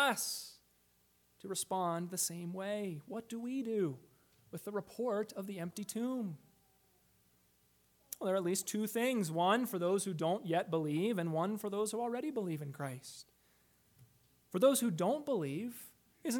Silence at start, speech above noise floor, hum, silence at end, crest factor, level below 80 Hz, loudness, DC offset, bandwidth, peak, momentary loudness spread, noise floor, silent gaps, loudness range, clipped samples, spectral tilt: 0 s; 36 dB; 60 Hz at -65 dBFS; 0 s; 20 dB; -82 dBFS; -37 LUFS; under 0.1%; 19 kHz; -16 dBFS; 13 LU; -73 dBFS; none; 7 LU; under 0.1%; -4.5 dB/octave